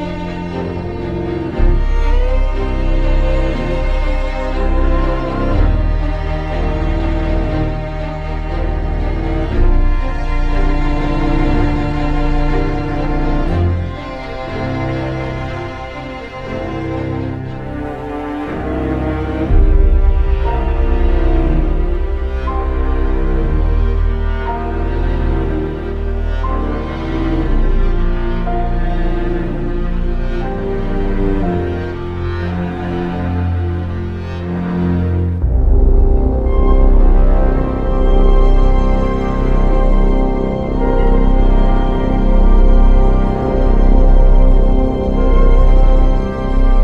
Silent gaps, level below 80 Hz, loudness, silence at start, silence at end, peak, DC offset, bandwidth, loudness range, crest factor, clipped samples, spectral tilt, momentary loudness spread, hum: none; -14 dBFS; -18 LUFS; 0 s; 0 s; -2 dBFS; under 0.1%; 4.8 kHz; 5 LU; 12 dB; under 0.1%; -9 dB/octave; 8 LU; none